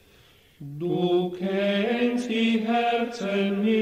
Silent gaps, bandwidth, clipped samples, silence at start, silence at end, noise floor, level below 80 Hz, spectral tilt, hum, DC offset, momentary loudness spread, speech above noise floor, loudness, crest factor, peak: none; 10 kHz; under 0.1%; 0.6 s; 0 s; -56 dBFS; -66 dBFS; -6.5 dB/octave; none; under 0.1%; 6 LU; 32 dB; -25 LUFS; 12 dB; -12 dBFS